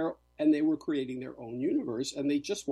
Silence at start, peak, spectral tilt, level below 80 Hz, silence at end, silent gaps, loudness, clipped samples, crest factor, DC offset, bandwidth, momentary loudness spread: 0 s; -16 dBFS; -5 dB/octave; -68 dBFS; 0 s; none; -31 LUFS; under 0.1%; 14 dB; under 0.1%; 12 kHz; 11 LU